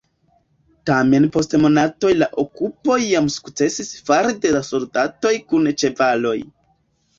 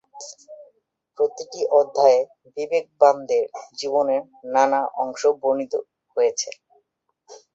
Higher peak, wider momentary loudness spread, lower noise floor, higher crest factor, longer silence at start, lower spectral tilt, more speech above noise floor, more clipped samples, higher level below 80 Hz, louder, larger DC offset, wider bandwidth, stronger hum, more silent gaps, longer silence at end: about the same, -2 dBFS vs -2 dBFS; second, 8 LU vs 14 LU; second, -63 dBFS vs -70 dBFS; about the same, 16 dB vs 20 dB; first, 0.85 s vs 0.15 s; first, -5 dB/octave vs -2.5 dB/octave; second, 45 dB vs 49 dB; neither; first, -54 dBFS vs -74 dBFS; first, -18 LUFS vs -22 LUFS; neither; about the same, 7.8 kHz vs 8 kHz; neither; neither; first, 0.75 s vs 0.2 s